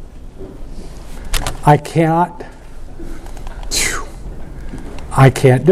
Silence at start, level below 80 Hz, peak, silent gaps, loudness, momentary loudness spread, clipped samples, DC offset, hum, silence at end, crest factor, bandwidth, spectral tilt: 0 s; -28 dBFS; 0 dBFS; none; -15 LUFS; 23 LU; under 0.1%; under 0.1%; none; 0 s; 16 dB; 15 kHz; -5.5 dB/octave